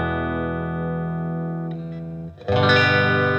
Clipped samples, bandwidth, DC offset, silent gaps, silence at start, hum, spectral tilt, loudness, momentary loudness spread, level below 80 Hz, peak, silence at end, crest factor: under 0.1%; 8 kHz; under 0.1%; none; 0 s; none; -7 dB/octave; -21 LUFS; 16 LU; -48 dBFS; -4 dBFS; 0 s; 18 dB